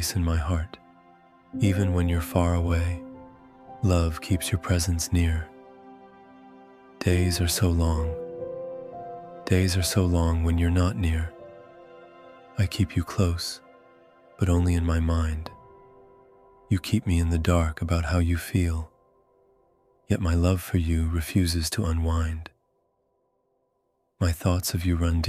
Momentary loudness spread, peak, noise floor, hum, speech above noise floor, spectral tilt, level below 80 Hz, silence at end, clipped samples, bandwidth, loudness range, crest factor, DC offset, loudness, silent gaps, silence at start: 14 LU; -6 dBFS; -73 dBFS; none; 49 dB; -5.5 dB/octave; -34 dBFS; 0 s; under 0.1%; 15.5 kHz; 3 LU; 20 dB; under 0.1%; -26 LUFS; none; 0 s